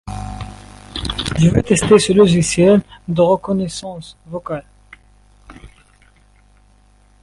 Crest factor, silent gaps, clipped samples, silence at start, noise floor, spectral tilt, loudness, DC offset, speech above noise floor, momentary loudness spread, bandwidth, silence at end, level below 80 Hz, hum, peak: 18 dB; none; under 0.1%; 0.05 s; -51 dBFS; -5.5 dB/octave; -15 LUFS; under 0.1%; 37 dB; 19 LU; 11.5 kHz; 1.55 s; -38 dBFS; 50 Hz at -40 dBFS; 0 dBFS